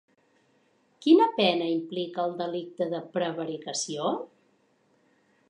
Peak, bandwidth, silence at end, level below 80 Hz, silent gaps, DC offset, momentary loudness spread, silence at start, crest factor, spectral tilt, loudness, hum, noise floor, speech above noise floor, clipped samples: -8 dBFS; 10.5 kHz; 1.25 s; -86 dBFS; none; under 0.1%; 13 LU; 1 s; 20 dB; -4 dB/octave; -27 LUFS; none; -67 dBFS; 41 dB; under 0.1%